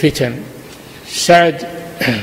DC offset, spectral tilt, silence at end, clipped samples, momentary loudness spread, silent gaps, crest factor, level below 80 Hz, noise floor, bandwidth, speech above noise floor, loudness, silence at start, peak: under 0.1%; -4 dB/octave; 0 s; under 0.1%; 24 LU; none; 16 dB; -44 dBFS; -35 dBFS; 16.5 kHz; 21 dB; -14 LUFS; 0 s; 0 dBFS